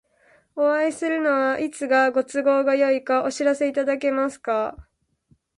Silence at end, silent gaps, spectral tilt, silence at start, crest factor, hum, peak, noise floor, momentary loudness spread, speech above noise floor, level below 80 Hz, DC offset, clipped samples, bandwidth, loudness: 0.75 s; none; -3.5 dB/octave; 0.55 s; 14 dB; none; -8 dBFS; -63 dBFS; 6 LU; 42 dB; -60 dBFS; under 0.1%; under 0.1%; 11.5 kHz; -22 LUFS